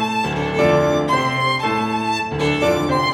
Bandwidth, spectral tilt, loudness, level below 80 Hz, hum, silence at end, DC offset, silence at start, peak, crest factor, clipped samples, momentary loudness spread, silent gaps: 16.5 kHz; -5.5 dB/octave; -18 LUFS; -44 dBFS; none; 0 s; under 0.1%; 0 s; -4 dBFS; 14 dB; under 0.1%; 5 LU; none